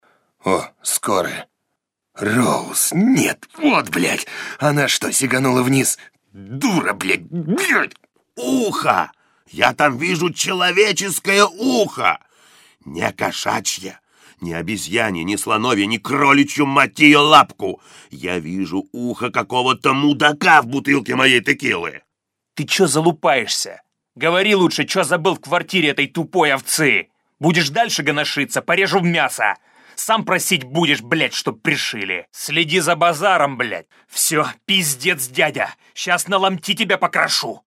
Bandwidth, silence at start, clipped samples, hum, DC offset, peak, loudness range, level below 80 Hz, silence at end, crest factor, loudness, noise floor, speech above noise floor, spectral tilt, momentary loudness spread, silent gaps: 16.5 kHz; 0.45 s; under 0.1%; none; under 0.1%; 0 dBFS; 5 LU; -62 dBFS; 0.1 s; 18 dB; -17 LUFS; -79 dBFS; 61 dB; -3.5 dB/octave; 11 LU; none